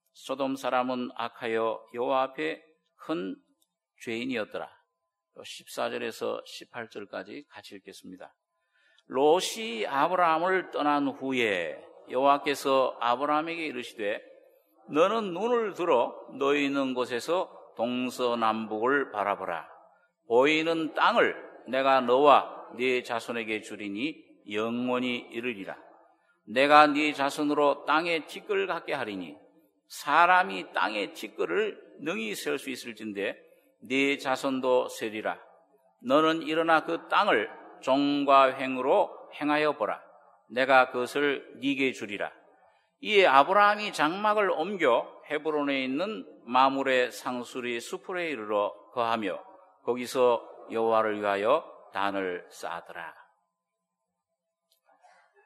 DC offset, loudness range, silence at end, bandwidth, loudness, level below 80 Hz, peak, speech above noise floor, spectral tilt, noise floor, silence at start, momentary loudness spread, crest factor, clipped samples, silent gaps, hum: under 0.1%; 9 LU; 2.35 s; 13.5 kHz; -27 LUFS; -84 dBFS; -4 dBFS; 57 dB; -4 dB/octave; -85 dBFS; 0.2 s; 16 LU; 26 dB; under 0.1%; none; none